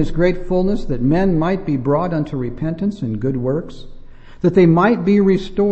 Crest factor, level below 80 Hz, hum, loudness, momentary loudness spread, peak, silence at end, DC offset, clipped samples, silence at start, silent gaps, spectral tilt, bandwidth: 16 dB; -30 dBFS; none; -17 LUFS; 9 LU; -2 dBFS; 0 s; under 0.1%; under 0.1%; 0 s; none; -9 dB/octave; 8 kHz